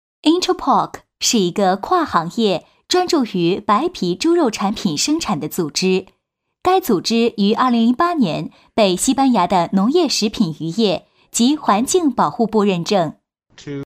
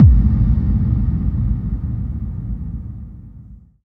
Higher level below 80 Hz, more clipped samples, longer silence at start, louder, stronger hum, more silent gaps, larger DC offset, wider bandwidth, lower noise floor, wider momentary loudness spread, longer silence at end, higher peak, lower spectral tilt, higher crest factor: second, -52 dBFS vs -20 dBFS; neither; first, 0.25 s vs 0 s; about the same, -17 LUFS vs -19 LUFS; neither; neither; neither; first, 15.5 kHz vs 2.2 kHz; first, -63 dBFS vs -40 dBFS; second, 6 LU vs 19 LU; second, 0 s vs 0.3 s; about the same, 0 dBFS vs 0 dBFS; second, -4.5 dB/octave vs -12.5 dB/octave; about the same, 16 dB vs 16 dB